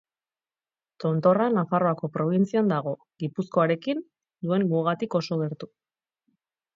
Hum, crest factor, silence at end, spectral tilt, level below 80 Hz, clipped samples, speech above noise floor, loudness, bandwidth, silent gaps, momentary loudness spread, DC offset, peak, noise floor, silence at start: none; 18 dB; 1.1 s; -8.5 dB/octave; -74 dBFS; under 0.1%; over 65 dB; -25 LUFS; 7.6 kHz; none; 11 LU; under 0.1%; -8 dBFS; under -90 dBFS; 1 s